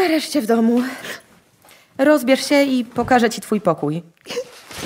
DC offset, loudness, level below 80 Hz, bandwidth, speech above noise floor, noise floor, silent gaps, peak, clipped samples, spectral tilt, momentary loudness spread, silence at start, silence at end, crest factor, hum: under 0.1%; -18 LUFS; -56 dBFS; 16 kHz; 33 dB; -51 dBFS; none; -2 dBFS; under 0.1%; -4.5 dB/octave; 15 LU; 0 s; 0 s; 16 dB; none